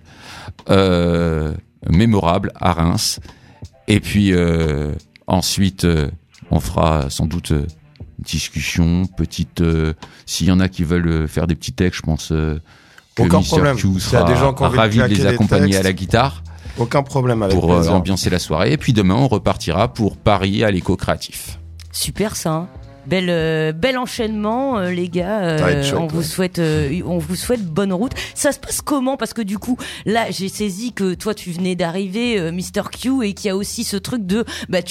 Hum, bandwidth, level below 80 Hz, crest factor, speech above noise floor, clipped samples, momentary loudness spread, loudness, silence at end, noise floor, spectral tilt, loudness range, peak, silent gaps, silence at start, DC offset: none; 16 kHz; -36 dBFS; 16 dB; 23 dB; under 0.1%; 9 LU; -18 LUFS; 0 s; -40 dBFS; -5.5 dB/octave; 5 LU; 0 dBFS; none; 0.2 s; under 0.1%